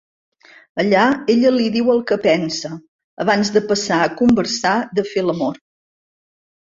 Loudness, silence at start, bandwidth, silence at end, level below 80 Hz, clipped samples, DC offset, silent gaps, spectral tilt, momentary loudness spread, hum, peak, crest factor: -17 LUFS; 0.75 s; 7.8 kHz; 1.15 s; -56 dBFS; under 0.1%; under 0.1%; 2.88-3.17 s; -4.5 dB/octave; 9 LU; none; -2 dBFS; 16 dB